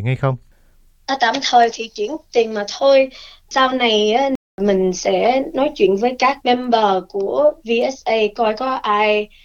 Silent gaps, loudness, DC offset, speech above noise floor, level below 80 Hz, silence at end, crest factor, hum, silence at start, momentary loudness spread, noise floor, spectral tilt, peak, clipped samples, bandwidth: 4.36-4.58 s; -17 LUFS; under 0.1%; 34 dB; -50 dBFS; 0.2 s; 16 dB; none; 0 s; 7 LU; -51 dBFS; -4.5 dB/octave; -2 dBFS; under 0.1%; 7.6 kHz